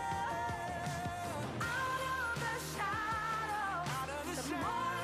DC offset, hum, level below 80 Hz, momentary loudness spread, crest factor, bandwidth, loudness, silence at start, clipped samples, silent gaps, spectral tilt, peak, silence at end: under 0.1%; none; -58 dBFS; 4 LU; 12 dB; 15.5 kHz; -37 LUFS; 0 s; under 0.1%; none; -4 dB/octave; -26 dBFS; 0 s